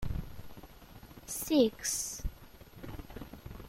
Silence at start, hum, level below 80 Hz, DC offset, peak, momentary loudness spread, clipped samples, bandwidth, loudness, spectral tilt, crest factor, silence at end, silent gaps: 0 s; none; -46 dBFS; under 0.1%; -14 dBFS; 25 LU; under 0.1%; 16 kHz; -33 LUFS; -4 dB/octave; 22 dB; 0 s; none